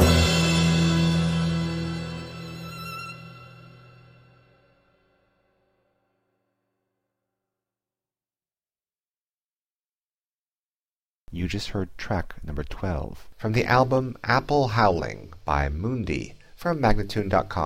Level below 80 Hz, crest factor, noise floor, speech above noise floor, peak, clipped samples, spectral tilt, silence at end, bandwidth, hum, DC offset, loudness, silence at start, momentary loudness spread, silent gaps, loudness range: -38 dBFS; 22 dB; under -90 dBFS; over 65 dB; -4 dBFS; under 0.1%; -5.5 dB/octave; 0 s; 15 kHz; none; under 0.1%; -25 LUFS; 0 s; 16 LU; 9.17-9.99 s, 10.05-10.15 s, 10.21-10.49 s, 10.58-11.27 s; 16 LU